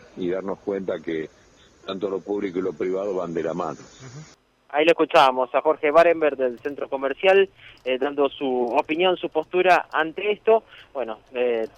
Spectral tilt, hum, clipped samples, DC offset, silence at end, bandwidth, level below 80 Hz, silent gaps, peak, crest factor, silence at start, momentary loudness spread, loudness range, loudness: -5 dB/octave; none; under 0.1%; under 0.1%; 0.1 s; 12 kHz; -62 dBFS; none; -6 dBFS; 18 dB; 0.15 s; 14 LU; 8 LU; -22 LUFS